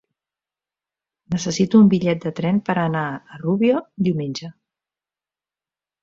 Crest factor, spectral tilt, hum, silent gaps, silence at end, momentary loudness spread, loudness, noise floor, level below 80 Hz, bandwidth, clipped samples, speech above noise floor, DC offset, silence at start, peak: 18 dB; -6.5 dB/octave; 50 Hz at -40 dBFS; none; 1.5 s; 14 LU; -20 LUFS; under -90 dBFS; -60 dBFS; 7.6 kHz; under 0.1%; over 71 dB; under 0.1%; 1.3 s; -2 dBFS